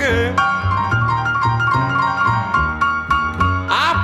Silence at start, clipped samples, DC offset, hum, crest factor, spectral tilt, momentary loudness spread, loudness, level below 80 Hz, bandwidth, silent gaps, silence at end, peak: 0 s; under 0.1%; under 0.1%; none; 14 dB; -5.5 dB/octave; 2 LU; -17 LUFS; -36 dBFS; 13 kHz; none; 0 s; -2 dBFS